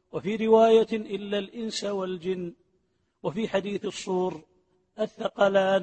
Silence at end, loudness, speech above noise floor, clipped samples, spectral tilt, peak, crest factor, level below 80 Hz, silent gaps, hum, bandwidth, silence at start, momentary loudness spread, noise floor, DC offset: 0 s; -26 LUFS; 47 dB; under 0.1%; -5.5 dB/octave; -8 dBFS; 18 dB; -66 dBFS; none; none; 8.8 kHz; 0.15 s; 14 LU; -72 dBFS; under 0.1%